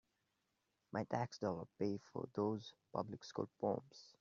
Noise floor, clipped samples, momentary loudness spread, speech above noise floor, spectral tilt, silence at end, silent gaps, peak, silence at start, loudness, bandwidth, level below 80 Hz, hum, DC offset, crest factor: -86 dBFS; under 0.1%; 6 LU; 42 dB; -6 dB/octave; 0.1 s; none; -24 dBFS; 0.95 s; -44 LUFS; 7.4 kHz; -82 dBFS; none; under 0.1%; 22 dB